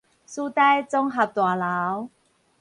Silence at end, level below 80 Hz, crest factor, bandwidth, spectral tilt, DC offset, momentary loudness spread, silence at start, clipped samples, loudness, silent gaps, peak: 0.55 s; -70 dBFS; 16 dB; 11 kHz; -5 dB/octave; under 0.1%; 13 LU; 0.3 s; under 0.1%; -23 LUFS; none; -8 dBFS